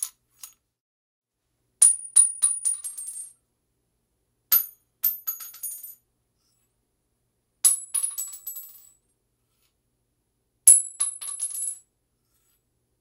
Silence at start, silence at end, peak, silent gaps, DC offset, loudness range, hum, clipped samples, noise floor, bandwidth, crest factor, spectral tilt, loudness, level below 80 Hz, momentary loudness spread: 0 s; 1.25 s; 0 dBFS; 0.80-1.22 s; under 0.1%; 6 LU; 60 Hz at -80 dBFS; under 0.1%; -77 dBFS; 17 kHz; 28 dB; 4.5 dB/octave; -20 LUFS; -80 dBFS; 21 LU